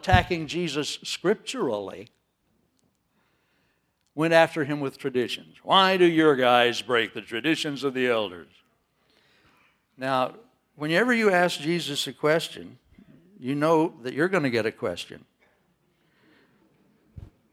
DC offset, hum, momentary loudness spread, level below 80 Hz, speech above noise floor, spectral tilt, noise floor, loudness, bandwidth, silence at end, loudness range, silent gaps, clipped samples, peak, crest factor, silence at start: under 0.1%; none; 15 LU; -48 dBFS; 47 dB; -5 dB/octave; -71 dBFS; -24 LUFS; 16 kHz; 0.3 s; 9 LU; none; under 0.1%; -2 dBFS; 24 dB; 0.05 s